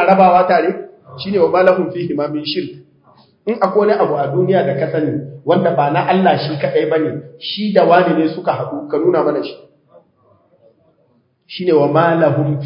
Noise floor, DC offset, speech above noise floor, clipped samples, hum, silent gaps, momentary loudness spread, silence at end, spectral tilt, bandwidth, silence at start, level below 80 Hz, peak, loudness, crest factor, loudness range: -58 dBFS; under 0.1%; 44 dB; under 0.1%; none; none; 12 LU; 0 s; -9.5 dB/octave; 5.4 kHz; 0 s; -62 dBFS; 0 dBFS; -15 LUFS; 16 dB; 4 LU